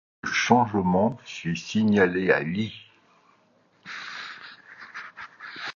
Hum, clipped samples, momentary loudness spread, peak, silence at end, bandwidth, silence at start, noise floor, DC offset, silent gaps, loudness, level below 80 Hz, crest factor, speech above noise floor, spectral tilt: none; under 0.1%; 20 LU; -6 dBFS; 0.05 s; 7.2 kHz; 0.25 s; -63 dBFS; under 0.1%; none; -24 LUFS; -58 dBFS; 22 dB; 40 dB; -5.5 dB/octave